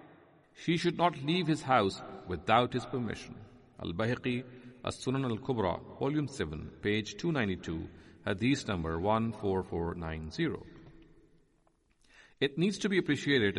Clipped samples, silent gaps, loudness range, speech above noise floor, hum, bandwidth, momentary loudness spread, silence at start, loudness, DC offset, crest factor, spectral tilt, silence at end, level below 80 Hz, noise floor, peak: under 0.1%; none; 5 LU; 38 dB; none; 11.5 kHz; 13 LU; 0 s; -33 LUFS; under 0.1%; 22 dB; -6 dB/octave; 0 s; -58 dBFS; -70 dBFS; -12 dBFS